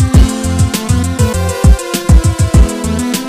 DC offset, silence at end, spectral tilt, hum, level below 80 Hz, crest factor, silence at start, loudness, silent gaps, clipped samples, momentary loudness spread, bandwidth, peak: 0.2%; 0 s; -5.5 dB/octave; none; -14 dBFS; 10 dB; 0 s; -12 LUFS; none; 1%; 4 LU; 16 kHz; 0 dBFS